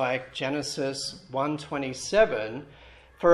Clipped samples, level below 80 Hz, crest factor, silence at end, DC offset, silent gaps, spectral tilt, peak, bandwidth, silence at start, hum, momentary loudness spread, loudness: under 0.1%; -56 dBFS; 20 dB; 0 s; under 0.1%; none; -4 dB/octave; -6 dBFS; 12.5 kHz; 0 s; none; 11 LU; -28 LUFS